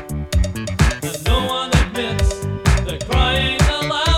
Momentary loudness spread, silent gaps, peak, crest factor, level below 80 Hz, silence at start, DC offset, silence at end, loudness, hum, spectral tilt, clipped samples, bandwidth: 5 LU; none; -2 dBFS; 16 dB; -22 dBFS; 0 s; under 0.1%; 0 s; -19 LUFS; none; -4.5 dB/octave; under 0.1%; 15.5 kHz